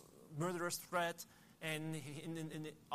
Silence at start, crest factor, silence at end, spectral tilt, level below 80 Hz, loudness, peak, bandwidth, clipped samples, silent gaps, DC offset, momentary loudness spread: 0 s; 20 dB; 0 s; -4.5 dB/octave; -78 dBFS; -44 LUFS; -24 dBFS; 15.5 kHz; under 0.1%; none; under 0.1%; 11 LU